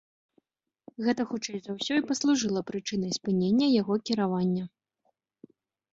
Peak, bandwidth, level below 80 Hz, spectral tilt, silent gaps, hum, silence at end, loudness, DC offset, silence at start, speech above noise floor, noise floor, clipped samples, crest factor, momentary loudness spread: -14 dBFS; 8 kHz; -70 dBFS; -5 dB/octave; none; none; 1.25 s; -28 LUFS; under 0.1%; 1 s; 48 dB; -76 dBFS; under 0.1%; 16 dB; 10 LU